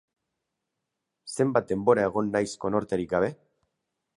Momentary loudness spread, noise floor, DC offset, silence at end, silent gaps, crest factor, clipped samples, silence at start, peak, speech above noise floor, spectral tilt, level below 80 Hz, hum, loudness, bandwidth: 7 LU; -83 dBFS; under 0.1%; 0.85 s; none; 22 dB; under 0.1%; 1.25 s; -6 dBFS; 58 dB; -6 dB/octave; -60 dBFS; none; -26 LUFS; 11.5 kHz